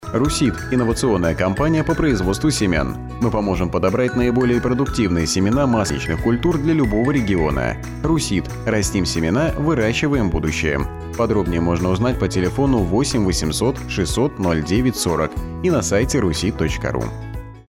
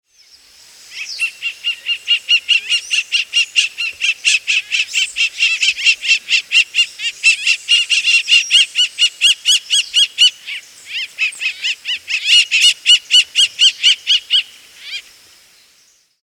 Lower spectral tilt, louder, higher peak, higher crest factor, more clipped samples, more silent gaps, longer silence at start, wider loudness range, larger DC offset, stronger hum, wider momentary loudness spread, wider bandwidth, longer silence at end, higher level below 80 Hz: first, -5.5 dB/octave vs 6 dB/octave; second, -19 LUFS vs -12 LUFS; second, -8 dBFS vs 0 dBFS; second, 10 dB vs 16 dB; neither; neither; second, 0 s vs 0.9 s; second, 1 LU vs 4 LU; neither; neither; second, 5 LU vs 11 LU; about the same, 16.5 kHz vs 17.5 kHz; second, 0.1 s vs 1.25 s; first, -30 dBFS vs -68 dBFS